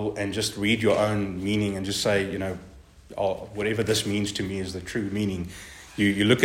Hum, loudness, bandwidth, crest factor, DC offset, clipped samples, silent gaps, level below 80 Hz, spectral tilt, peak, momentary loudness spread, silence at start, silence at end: none; -26 LUFS; 16 kHz; 22 dB; under 0.1%; under 0.1%; none; -52 dBFS; -4.5 dB/octave; -4 dBFS; 11 LU; 0 s; 0 s